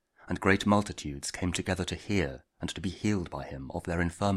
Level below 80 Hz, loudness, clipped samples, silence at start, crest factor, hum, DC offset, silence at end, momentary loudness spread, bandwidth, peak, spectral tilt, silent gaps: -50 dBFS; -31 LUFS; under 0.1%; 0.25 s; 22 dB; none; under 0.1%; 0 s; 12 LU; 13.5 kHz; -8 dBFS; -5 dB/octave; none